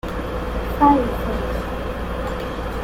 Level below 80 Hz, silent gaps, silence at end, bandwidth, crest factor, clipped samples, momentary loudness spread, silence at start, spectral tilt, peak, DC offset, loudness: -30 dBFS; none; 0 s; 16.5 kHz; 18 dB; under 0.1%; 11 LU; 0.05 s; -7 dB/octave; -2 dBFS; under 0.1%; -22 LUFS